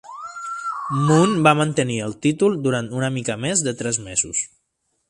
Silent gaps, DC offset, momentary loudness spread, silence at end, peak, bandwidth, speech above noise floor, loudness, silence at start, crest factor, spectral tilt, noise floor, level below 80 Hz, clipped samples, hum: none; under 0.1%; 12 LU; 0.65 s; 0 dBFS; 11.5 kHz; 52 dB; -20 LUFS; 0.05 s; 20 dB; -4.5 dB/octave; -72 dBFS; -56 dBFS; under 0.1%; none